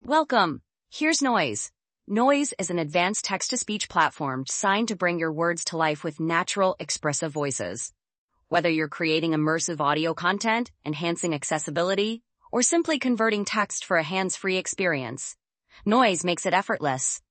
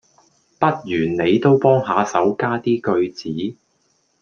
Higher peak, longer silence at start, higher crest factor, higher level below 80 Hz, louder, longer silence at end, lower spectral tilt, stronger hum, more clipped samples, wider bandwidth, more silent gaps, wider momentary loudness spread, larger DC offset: second, -6 dBFS vs -2 dBFS; second, 0.05 s vs 0.6 s; about the same, 20 dB vs 18 dB; second, -68 dBFS vs -58 dBFS; second, -25 LUFS vs -19 LUFS; second, 0.15 s vs 0.7 s; second, -3.5 dB/octave vs -7 dB/octave; neither; neither; first, 8.8 kHz vs 7.2 kHz; first, 8.18-8.28 s vs none; second, 8 LU vs 11 LU; neither